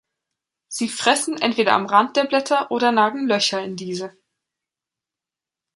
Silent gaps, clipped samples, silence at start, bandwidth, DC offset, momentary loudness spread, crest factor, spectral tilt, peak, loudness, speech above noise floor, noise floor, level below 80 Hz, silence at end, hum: none; under 0.1%; 0.7 s; 11.5 kHz; under 0.1%; 12 LU; 20 dB; -3 dB/octave; -2 dBFS; -19 LUFS; 69 dB; -89 dBFS; -72 dBFS; 1.65 s; none